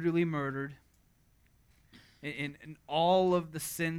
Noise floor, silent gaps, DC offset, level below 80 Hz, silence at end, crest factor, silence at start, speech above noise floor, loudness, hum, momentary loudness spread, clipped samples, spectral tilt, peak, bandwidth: -67 dBFS; none; under 0.1%; -66 dBFS; 0 s; 16 dB; 0 s; 36 dB; -32 LUFS; none; 16 LU; under 0.1%; -5.5 dB/octave; -16 dBFS; 18.5 kHz